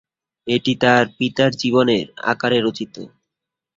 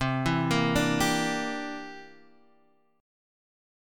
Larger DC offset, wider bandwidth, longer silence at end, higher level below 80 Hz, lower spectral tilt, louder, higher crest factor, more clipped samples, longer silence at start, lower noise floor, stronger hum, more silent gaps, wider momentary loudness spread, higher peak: neither; second, 7.8 kHz vs 17.5 kHz; second, 0.7 s vs 1.9 s; second, -58 dBFS vs -50 dBFS; about the same, -5.5 dB/octave vs -4.5 dB/octave; first, -18 LUFS vs -27 LUFS; about the same, 18 dB vs 20 dB; neither; first, 0.45 s vs 0 s; first, -83 dBFS vs -66 dBFS; neither; neither; about the same, 16 LU vs 16 LU; first, -2 dBFS vs -10 dBFS